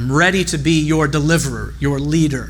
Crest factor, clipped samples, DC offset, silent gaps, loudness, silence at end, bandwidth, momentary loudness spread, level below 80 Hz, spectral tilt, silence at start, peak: 14 dB; under 0.1%; under 0.1%; none; -16 LUFS; 0 s; 19.5 kHz; 7 LU; -32 dBFS; -5 dB/octave; 0 s; -2 dBFS